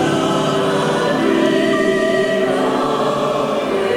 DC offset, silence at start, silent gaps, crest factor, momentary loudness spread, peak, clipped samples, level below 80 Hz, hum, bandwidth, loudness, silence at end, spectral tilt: under 0.1%; 0 s; none; 14 dB; 3 LU; -2 dBFS; under 0.1%; -50 dBFS; none; 16 kHz; -16 LUFS; 0 s; -5 dB/octave